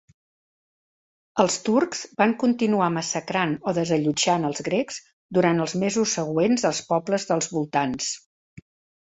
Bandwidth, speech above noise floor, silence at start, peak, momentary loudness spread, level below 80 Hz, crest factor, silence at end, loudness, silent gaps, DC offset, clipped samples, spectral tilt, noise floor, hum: 8.4 kHz; over 67 dB; 1.35 s; -4 dBFS; 6 LU; -64 dBFS; 20 dB; 0.4 s; -23 LUFS; 5.13-5.29 s, 8.26-8.57 s; under 0.1%; under 0.1%; -4.5 dB/octave; under -90 dBFS; none